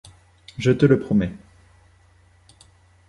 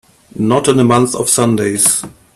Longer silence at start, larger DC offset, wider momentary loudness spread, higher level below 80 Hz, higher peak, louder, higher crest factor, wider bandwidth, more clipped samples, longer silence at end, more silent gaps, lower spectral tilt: first, 0.6 s vs 0.35 s; neither; first, 13 LU vs 5 LU; about the same, -48 dBFS vs -50 dBFS; about the same, -2 dBFS vs 0 dBFS; second, -20 LUFS vs -12 LUFS; first, 22 dB vs 14 dB; second, 11.5 kHz vs 15 kHz; neither; first, 1.7 s vs 0.25 s; neither; first, -8 dB/octave vs -4 dB/octave